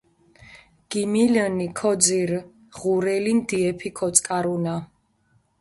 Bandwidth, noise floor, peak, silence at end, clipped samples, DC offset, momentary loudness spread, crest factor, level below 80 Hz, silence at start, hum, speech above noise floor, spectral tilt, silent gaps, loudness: 11.5 kHz; -64 dBFS; 0 dBFS; 0.75 s; under 0.1%; under 0.1%; 10 LU; 22 dB; -60 dBFS; 0.5 s; none; 42 dB; -4 dB/octave; none; -22 LUFS